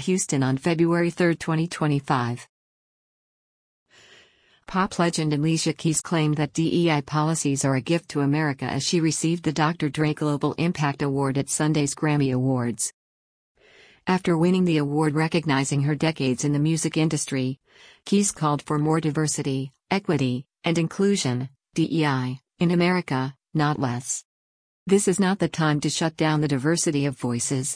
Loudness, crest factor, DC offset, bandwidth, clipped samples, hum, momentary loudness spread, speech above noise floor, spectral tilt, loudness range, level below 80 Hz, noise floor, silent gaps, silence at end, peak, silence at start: -24 LUFS; 16 dB; under 0.1%; 10.5 kHz; under 0.1%; none; 6 LU; 35 dB; -5 dB/octave; 3 LU; -60 dBFS; -58 dBFS; 2.49-3.86 s, 12.93-13.55 s, 24.25-24.86 s; 0 s; -8 dBFS; 0 s